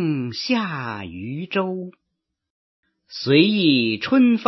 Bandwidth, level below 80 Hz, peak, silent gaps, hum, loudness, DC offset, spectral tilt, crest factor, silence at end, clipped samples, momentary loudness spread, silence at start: 6.2 kHz; -64 dBFS; -2 dBFS; 2.50-2.83 s; none; -20 LUFS; under 0.1%; -6.5 dB/octave; 20 dB; 0 s; under 0.1%; 15 LU; 0 s